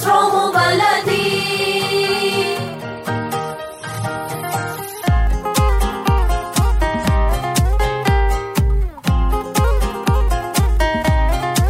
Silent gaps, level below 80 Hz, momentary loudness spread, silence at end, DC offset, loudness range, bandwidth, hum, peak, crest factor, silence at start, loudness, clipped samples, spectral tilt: none; -20 dBFS; 9 LU; 0 s; under 0.1%; 4 LU; 16 kHz; none; -2 dBFS; 14 dB; 0 s; -18 LUFS; under 0.1%; -5 dB/octave